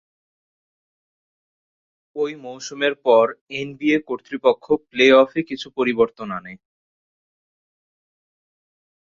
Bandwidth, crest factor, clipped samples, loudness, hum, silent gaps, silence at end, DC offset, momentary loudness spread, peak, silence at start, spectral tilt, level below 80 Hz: 7.6 kHz; 20 dB; under 0.1%; -19 LUFS; none; 3.41-3.47 s; 2.6 s; under 0.1%; 16 LU; -2 dBFS; 2.15 s; -4.5 dB/octave; -64 dBFS